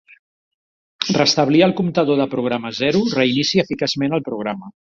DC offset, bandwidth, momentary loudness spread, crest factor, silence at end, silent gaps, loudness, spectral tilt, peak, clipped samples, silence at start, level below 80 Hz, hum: under 0.1%; 7.6 kHz; 11 LU; 18 dB; 0.25 s; none; -18 LUFS; -5 dB/octave; -2 dBFS; under 0.1%; 1 s; -58 dBFS; none